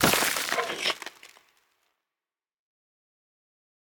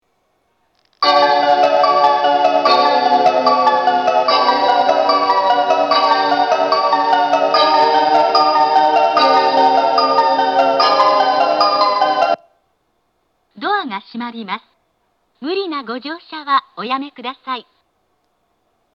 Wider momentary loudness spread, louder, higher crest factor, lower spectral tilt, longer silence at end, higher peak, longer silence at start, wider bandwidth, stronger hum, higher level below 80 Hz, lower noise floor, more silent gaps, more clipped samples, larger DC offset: about the same, 12 LU vs 14 LU; second, -26 LUFS vs -14 LUFS; first, 26 dB vs 14 dB; second, -2 dB/octave vs -3.5 dB/octave; first, 2.6 s vs 1.35 s; second, -6 dBFS vs 0 dBFS; second, 0 s vs 1 s; first, over 20 kHz vs 7.2 kHz; neither; first, -60 dBFS vs -74 dBFS; first, under -90 dBFS vs -65 dBFS; neither; neither; neither